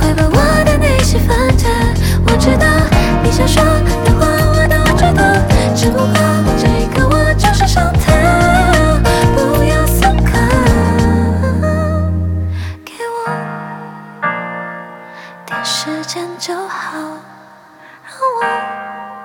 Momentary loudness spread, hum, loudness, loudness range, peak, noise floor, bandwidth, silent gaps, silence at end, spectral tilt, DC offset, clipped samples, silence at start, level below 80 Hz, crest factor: 14 LU; none; -13 LUFS; 10 LU; 0 dBFS; -40 dBFS; 18 kHz; none; 0 s; -5.5 dB/octave; under 0.1%; under 0.1%; 0 s; -18 dBFS; 12 dB